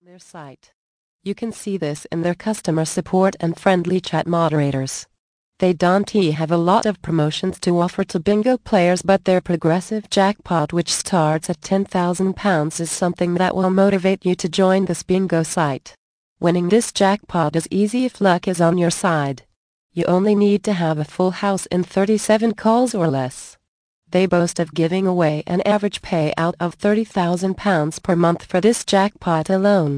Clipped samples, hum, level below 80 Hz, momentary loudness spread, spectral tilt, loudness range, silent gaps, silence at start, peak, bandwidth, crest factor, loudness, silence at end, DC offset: under 0.1%; none; -52 dBFS; 6 LU; -5.5 dB/octave; 2 LU; 0.73-1.19 s, 5.19-5.52 s, 15.98-16.36 s, 19.56-19.90 s, 23.68-24.02 s; 0.35 s; -2 dBFS; 10.5 kHz; 16 dB; -19 LUFS; 0 s; under 0.1%